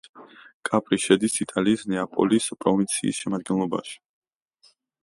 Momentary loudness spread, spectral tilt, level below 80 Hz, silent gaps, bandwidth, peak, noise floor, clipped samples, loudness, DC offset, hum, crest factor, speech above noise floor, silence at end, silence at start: 9 LU; -4.5 dB/octave; -64 dBFS; 0.54-0.61 s; 11.5 kHz; -4 dBFS; -62 dBFS; under 0.1%; -24 LUFS; under 0.1%; none; 22 dB; 38 dB; 1.1 s; 0.15 s